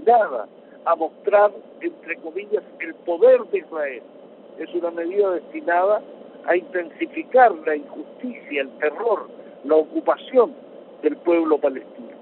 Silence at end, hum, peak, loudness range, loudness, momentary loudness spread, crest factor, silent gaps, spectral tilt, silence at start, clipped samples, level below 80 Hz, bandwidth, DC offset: 0.05 s; none; -2 dBFS; 3 LU; -21 LUFS; 17 LU; 18 dB; none; -2.5 dB/octave; 0 s; under 0.1%; -74 dBFS; 4.2 kHz; under 0.1%